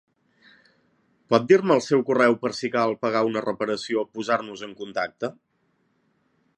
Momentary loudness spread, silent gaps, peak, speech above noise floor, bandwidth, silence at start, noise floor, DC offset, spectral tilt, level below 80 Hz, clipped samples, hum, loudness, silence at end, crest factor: 13 LU; none; -2 dBFS; 46 dB; 10.5 kHz; 1.3 s; -69 dBFS; under 0.1%; -5.5 dB/octave; -72 dBFS; under 0.1%; none; -23 LUFS; 1.25 s; 22 dB